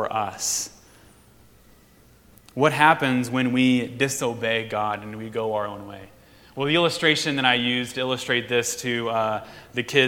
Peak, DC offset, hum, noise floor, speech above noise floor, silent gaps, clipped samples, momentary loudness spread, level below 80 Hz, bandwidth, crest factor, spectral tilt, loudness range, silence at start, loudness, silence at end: 0 dBFS; under 0.1%; none; -54 dBFS; 31 dB; none; under 0.1%; 13 LU; -60 dBFS; 18 kHz; 24 dB; -3.5 dB/octave; 3 LU; 0 s; -23 LUFS; 0 s